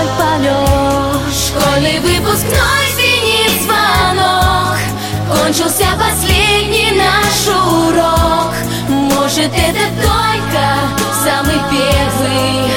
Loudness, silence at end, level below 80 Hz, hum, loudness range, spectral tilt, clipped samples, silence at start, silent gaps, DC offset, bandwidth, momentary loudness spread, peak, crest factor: -12 LUFS; 0 s; -24 dBFS; none; 2 LU; -3.5 dB/octave; under 0.1%; 0 s; none; 0.2%; 17 kHz; 4 LU; 0 dBFS; 12 dB